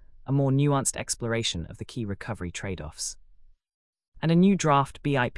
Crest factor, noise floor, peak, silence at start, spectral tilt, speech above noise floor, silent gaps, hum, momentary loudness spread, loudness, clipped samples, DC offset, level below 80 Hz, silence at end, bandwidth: 16 dB; -54 dBFS; -10 dBFS; 0.25 s; -5 dB/octave; 28 dB; 3.74-3.93 s, 4.08-4.12 s; none; 13 LU; -26 LUFS; under 0.1%; under 0.1%; -50 dBFS; 0 s; 12 kHz